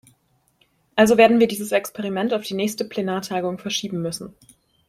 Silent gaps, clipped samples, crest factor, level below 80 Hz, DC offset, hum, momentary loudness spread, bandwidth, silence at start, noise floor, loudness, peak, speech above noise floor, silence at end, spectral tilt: none; under 0.1%; 20 dB; -60 dBFS; under 0.1%; none; 13 LU; 15.5 kHz; 0.95 s; -64 dBFS; -21 LUFS; -2 dBFS; 43 dB; 0.6 s; -4.5 dB/octave